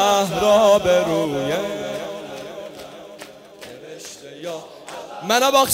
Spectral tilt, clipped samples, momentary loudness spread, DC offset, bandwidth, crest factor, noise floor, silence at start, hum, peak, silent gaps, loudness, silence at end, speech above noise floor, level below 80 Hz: -3.5 dB/octave; under 0.1%; 23 LU; under 0.1%; 16 kHz; 18 dB; -40 dBFS; 0 s; none; -2 dBFS; none; -18 LUFS; 0 s; 23 dB; -54 dBFS